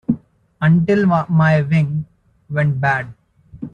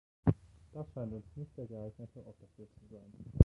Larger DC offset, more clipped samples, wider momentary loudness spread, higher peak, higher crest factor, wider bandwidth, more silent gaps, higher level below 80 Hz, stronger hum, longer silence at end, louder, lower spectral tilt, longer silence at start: neither; neither; second, 13 LU vs 23 LU; first, -4 dBFS vs -8 dBFS; second, 14 dB vs 30 dB; first, 6.8 kHz vs 4.2 kHz; neither; about the same, -52 dBFS vs -50 dBFS; neither; about the same, 0.05 s vs 0 s; first, -17 LUFS vs -42 LUFS; second, -9 dB/octave vs -11.5 dB/octave; second, 0.1 s vs 0.25 s